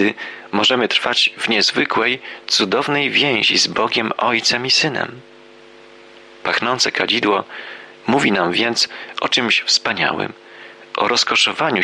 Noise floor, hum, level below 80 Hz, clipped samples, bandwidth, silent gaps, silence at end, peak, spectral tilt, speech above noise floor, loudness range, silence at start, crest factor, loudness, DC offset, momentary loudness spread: -43 dBFS; none; -62 dBFS; under 0.1%; 12 kHz; none; 0 s; -2 dBFS; -2.5 dB/octave; 25 dB; 4 LU; 0 s; 16 dB; -16 LUFS; under 0.1%; 11 LU